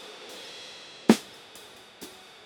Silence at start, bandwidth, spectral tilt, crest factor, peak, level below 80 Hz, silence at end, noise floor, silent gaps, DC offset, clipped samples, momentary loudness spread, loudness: 0.05 s; 19.5 kHz; -4.5 dB/octave; 30 dB; -2 dBFS; -70 dBFS; 0.4 s; -49 dBFS; none; under 0.1%; under 0.1%; 22 LU; -27 LUFS